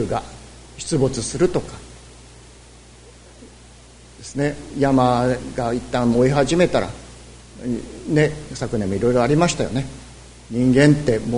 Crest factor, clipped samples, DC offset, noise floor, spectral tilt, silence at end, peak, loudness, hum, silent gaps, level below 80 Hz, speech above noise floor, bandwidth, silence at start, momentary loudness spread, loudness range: 20 dB; under 0.1%; under 0.1%; -45 dBFS; -6 dB/octave; 0 s; 0 dBFS; -20 LUFS; none; none; -42 dBFS; 26 dB; 11 kHz; 0 s; 21 LU; 8 LU